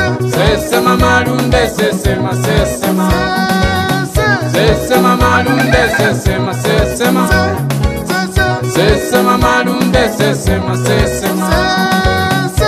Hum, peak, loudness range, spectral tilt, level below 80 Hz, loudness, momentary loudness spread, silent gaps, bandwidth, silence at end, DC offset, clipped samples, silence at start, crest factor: none; 0 dBFS; 1 LU; -5 dB/octave; -24 dBFS; -12 LUFS; 4 LU; none; 15.5 kHz; 0 s; under 0.1%; under 0.1%; 0 s; 12 dB